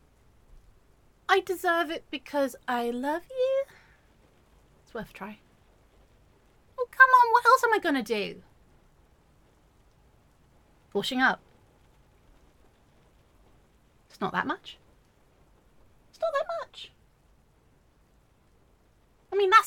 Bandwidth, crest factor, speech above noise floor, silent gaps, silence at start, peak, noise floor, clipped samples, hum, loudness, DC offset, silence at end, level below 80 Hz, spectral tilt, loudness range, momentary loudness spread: 17.5 kHz; 26 dB; 38 dB; none; 1.3 s; -4 dBFS; -63 dBFS; under 0.1%; none; -26 LUFS; under 0.1%; 0 s; -64 dBFS; -3.5 dB/octave; 14 LU; 22 LU